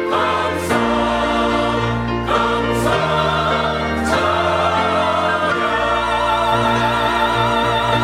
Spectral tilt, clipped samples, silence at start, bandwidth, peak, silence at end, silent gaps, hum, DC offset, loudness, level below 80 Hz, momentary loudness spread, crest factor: -5 dB/octave; under 0.1%; 0 s; 17 kHz; -4 dBFS; 0 s; none; none; under 0.1%; -17 LUFS; -36 dBFS; 2 LU; 14 dB